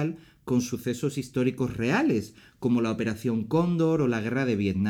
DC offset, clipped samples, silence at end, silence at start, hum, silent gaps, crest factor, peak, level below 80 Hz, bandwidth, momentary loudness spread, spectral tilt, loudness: under 0.1%; under 0.1%; 0 s; 0 s; none; none; 14 dB; -12 dBFS; -58 dBFS; 17 kHz; 7 LU; -6.5 dB/octave; -27 LUFS